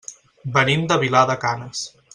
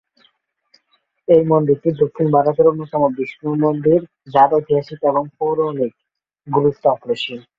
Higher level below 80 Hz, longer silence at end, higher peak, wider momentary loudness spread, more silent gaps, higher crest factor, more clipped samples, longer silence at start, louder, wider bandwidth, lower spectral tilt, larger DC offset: about the same, -58 dBFS vs -58 dBFS; about the same, 0.25 s vs 0.2 s; about the same, -2 dBFS vs -2 dBFS; first, 15 LU vs 8 LU; neither; about the same, 18 dB vs 16 dB; neither; second, 0.1 s vs 1.3 s; about the same, -19 LUFS vs -17 LUFS; first, 11 kHz vs 7.4 kHz; second, -4.5 dB/octave vs -9 dB/octave; neither